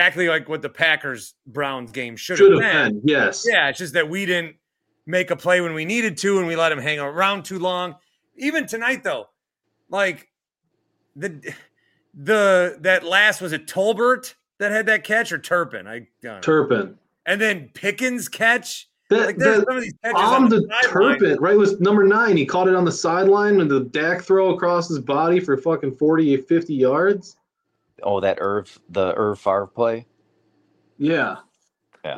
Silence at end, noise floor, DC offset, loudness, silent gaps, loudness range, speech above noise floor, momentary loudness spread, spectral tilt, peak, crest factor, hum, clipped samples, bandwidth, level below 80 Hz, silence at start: 0 s; -76 dBFS; under 0.1%; -19 LUFS; none; 8 LU; 57 dB; 14 LU; -4.5 dB/octave; -2 dBFS; 18 dB; none; under 0.1%; 16 kHz; -66 dBFS; 0 s